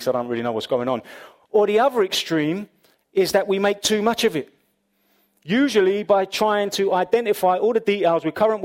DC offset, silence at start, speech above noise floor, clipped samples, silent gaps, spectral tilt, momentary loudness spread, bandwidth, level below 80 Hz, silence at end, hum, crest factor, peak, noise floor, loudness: under 0.1%; 0 s; 47 dB; under 0.1%; none; -4 dB/octave; 7 LU; 16.5 kHz; -62 dBFS; 0 s; none; 16 dB; -4 dBFS; -67 dBFS; -20 LUFS